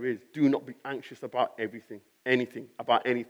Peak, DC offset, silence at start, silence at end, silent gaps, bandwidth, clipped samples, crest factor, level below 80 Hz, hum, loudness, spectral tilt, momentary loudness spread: -10 dBFS; under 0.1%; 0 s; 0.05 s; none; 11.5 kHz; under 0.1%; 20 dB; under -90 dBFS; none; -30 LUFS; -6.5 dB/octave; 12 LU